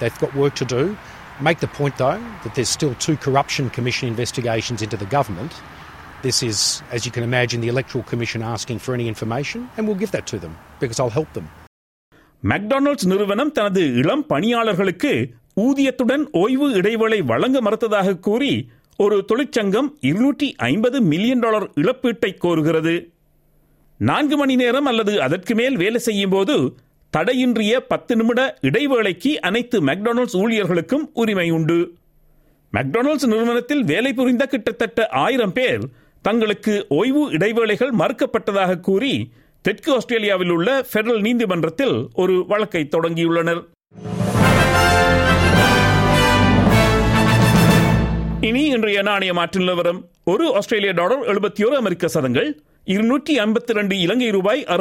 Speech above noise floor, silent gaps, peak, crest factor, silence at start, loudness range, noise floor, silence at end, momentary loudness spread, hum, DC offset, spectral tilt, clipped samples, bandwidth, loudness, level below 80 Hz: 39 dB; 11.67-12.12 s; -2 dBFS; 16 dB; 0 s; 7 LU; -57 dBFS; 0 s; 10 LU; none; under 0.1%; -5.5 dB/octave; under 0.1%; 16.5 kHz; -18 LUFS; -38 dBFS